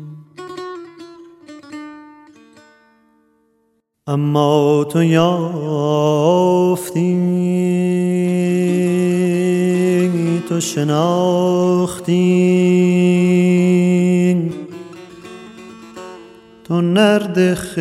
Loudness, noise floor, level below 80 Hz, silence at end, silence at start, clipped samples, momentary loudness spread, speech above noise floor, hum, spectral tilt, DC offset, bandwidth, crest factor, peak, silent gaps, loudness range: -15 LUFS; -64 dBFS; -58 dBFS; 0 s; 0 s; under 0.1%; 21 LU; 50 dB; none; -7 dB/octave; under 0.1%; 14 kHz; 16 dB; 0 dBFS; none; 6 LU